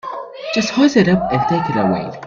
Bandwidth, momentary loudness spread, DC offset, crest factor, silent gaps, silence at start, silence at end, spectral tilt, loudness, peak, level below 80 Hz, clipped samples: 7.6 kHz; 10 LU; under 0.1%; 16 dB; none; 0.05 s; 0 s; -6 dB/octave; -16 LUFS; 0 dBFS; -48 dBFS; under 0.1%